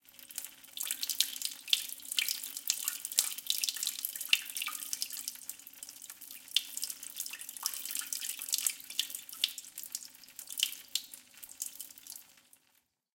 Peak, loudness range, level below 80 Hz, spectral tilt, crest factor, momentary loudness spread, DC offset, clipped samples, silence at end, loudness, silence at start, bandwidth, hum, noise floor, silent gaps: -4 dBFS; 6 LU; -88 dBFS; 4 dB/octave; 34 dB; 15 LU; under 0.1%; under 0.1%; 0.8 s; -34 LUFS; 0.05 s; 17 kHz; none; -74 dBFS; none